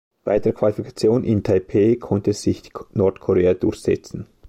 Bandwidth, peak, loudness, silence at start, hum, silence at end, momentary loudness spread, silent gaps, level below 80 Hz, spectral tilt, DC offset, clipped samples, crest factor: 13.5 kHz; -6 dBFS; -20 LUFS; 0.25 s; none; 0.25 s; 7 LU; none; -48 dBFS; -7.5 dB/octave; under 0.1%; under 0.1%; 14 dB